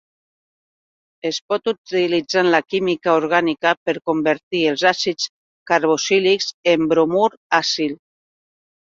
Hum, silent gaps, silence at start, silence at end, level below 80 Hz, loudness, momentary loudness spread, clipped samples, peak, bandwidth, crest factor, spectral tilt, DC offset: none; 1.41-1.49 s, 1.78-1.85 s, 3.77-3.86 s, 4.43-4.51 s, 5.29-5.66 s, 6.54-6.63 s, 7.37-7.50 s; 1.25 s; 0.9 s; -64 dBFS; -19 LUFS; 6 LU; under 0.1%; -2 dBFS; 7.8 kHz; 18 dB; -3.5 dB/octave; under 0.1%